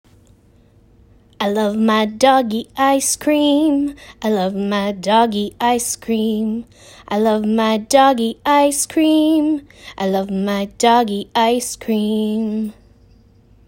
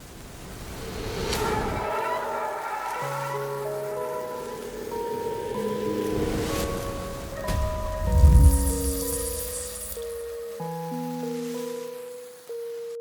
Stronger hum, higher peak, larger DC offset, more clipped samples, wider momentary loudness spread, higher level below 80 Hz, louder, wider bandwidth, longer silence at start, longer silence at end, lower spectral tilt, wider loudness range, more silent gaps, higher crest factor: neither; first, 0 dBFS vs -4 dBFS; neither; neither; about the same, 9 LU vs 11 LU; second, -52 dBFS vs -30 dBFS; first, -17 LUFS vs -28 LUFS; second, 16.5 kHz vs over 20 kHz; first, 1.4 s vs 0 s; first, 0.95 s vs 0 s; second, -4 dB/octave vs -5.5 dB/octave; second, 3 LU vs 7 LU; neither; second, 16 dB vs 22 dB